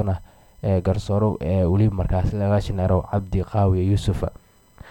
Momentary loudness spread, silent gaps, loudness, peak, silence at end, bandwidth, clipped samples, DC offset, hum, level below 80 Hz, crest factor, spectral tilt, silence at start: 7 LU; none; -22 LUFS; -8 dBFS; 0 s; 10 kHz; under 0.1%; under 0.1%; none; -34 dBFS; 14 dB; -8.5 dB/octave; 0 s